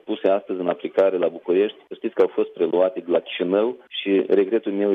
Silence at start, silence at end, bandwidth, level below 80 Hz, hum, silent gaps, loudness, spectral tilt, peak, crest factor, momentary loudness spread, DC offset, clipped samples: 0.05 s; 0 s; 4.6 kHz; -76 dBFS; none; none; -22 LUFS; -8 dB/octave; -6 dBFS; 14 dB; 6 LU; under 0.1%; under 0.1%